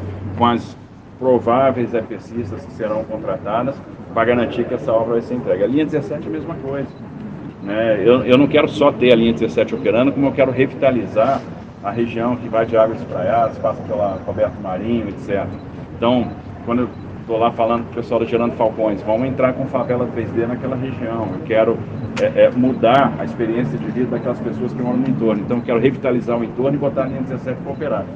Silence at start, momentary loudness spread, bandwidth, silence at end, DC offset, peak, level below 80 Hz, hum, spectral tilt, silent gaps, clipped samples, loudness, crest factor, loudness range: 0 s; 11 LU; 7.8 kHz; 0 s; under 0.1%; 0 dBFS; -48 dBFS; none; -8 dB/octave; none; under 0.1%; -18 LUFS; 18 dB; 5 LU